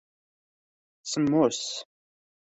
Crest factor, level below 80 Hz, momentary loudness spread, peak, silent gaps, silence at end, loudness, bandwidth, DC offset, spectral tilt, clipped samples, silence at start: 20 dB; -70 dBFS; 15 LU; -10 dBFS; none; 0.7 s; -26 LUFS; 8.4 kHz; under 0.1%; -4.5 dB/octave; under 0.1%; 1.05 s